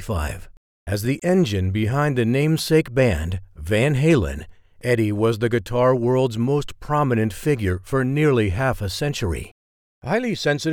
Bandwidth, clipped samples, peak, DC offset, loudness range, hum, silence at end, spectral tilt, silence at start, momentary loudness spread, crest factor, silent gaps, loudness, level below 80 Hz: 18 kHz; under 0.1%; -4 dBFS; under 0.1%; 2 LU; none; 0 s; -6.5 dB/octave; 0 s; 11 LU; 16 dB; 0.57-0.86 s, 9.51-10.01 s; -21 LUFS; -38 dBFS